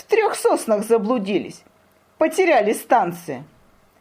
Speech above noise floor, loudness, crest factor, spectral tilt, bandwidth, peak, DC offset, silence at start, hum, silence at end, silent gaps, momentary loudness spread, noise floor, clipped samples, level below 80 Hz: 38 dB; -19 LUFS; 18 dB; -4.5 dB/octave; 16 kHz; -4 dBFS; under 0.1%; 0.1 s; none; 0.55 s; none; 15 LU; -57 dBFS; under 0.1%; -66 dBFS